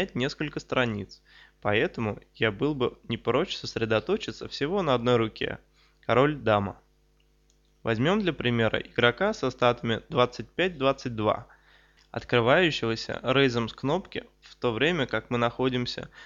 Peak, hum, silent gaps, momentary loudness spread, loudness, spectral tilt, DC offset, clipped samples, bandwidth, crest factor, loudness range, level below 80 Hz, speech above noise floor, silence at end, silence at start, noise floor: -6 dBFS; none; none; 10 LU; -27 LUFS; -6 dB/octave; under 0.1%; under 0.1%; 7.6 kHz; 22 dB; 3 LU; -54 dBFS; 38 dB; 0 s; 0 s; -64 dBFS